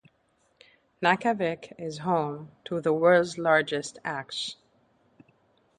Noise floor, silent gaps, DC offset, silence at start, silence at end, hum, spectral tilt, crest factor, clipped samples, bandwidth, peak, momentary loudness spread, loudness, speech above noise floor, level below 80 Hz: -69 dBFS; none; under 0.1%; 1 s; 1.25 s; none; -5 dB/octave; 22 dB; under 0.1%; 10.5 kHz; -6 dBFS; 13 LU; -27 LUFS; 43 dB; -70 dBFS